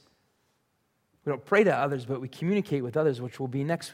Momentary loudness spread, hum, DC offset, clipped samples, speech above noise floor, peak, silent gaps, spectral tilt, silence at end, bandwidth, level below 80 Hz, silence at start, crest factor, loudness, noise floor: 11 LU; none; under 0.1%; under 0.1%; 46 dB; -8 dBFS; none; -7 dB/octave; 0 s; 15 kHz; -74 dBFS; 1.25 s; 20 dB; -28 LUFS; -74 dBFS